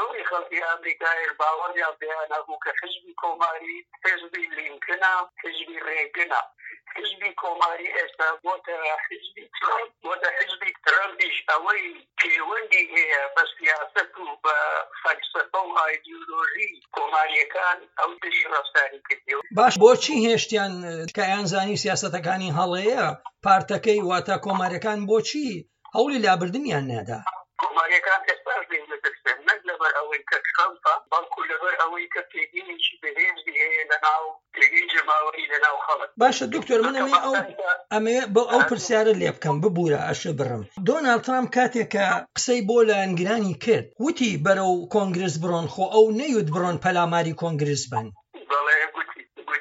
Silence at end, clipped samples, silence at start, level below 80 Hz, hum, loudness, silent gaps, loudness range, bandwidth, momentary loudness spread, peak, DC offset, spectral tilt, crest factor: 0 s; under 0.1%; 0 s; -72 dBFS; none; -23 LUFS; none; 5 LU; 8 kHz; 10 LU; -2 dBFS; under 0.1%; -4 dB/octave; 22 dB